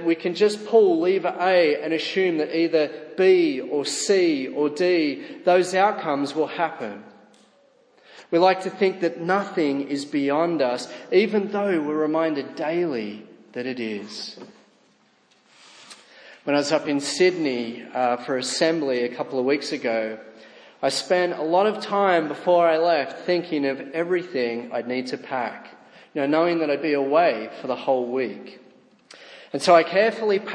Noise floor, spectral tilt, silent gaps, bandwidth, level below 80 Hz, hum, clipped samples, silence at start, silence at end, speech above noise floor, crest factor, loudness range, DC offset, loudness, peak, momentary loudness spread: -60 dBFS; -4.5 dB/octave; none; 10.5 kHz; -82 dBFS; none; under 0.1%; 0 s; 0 s; 38 dB; 20 dB; 6 LU; under 0.1%; -22 LUFS; -4 dBFS; 11 LU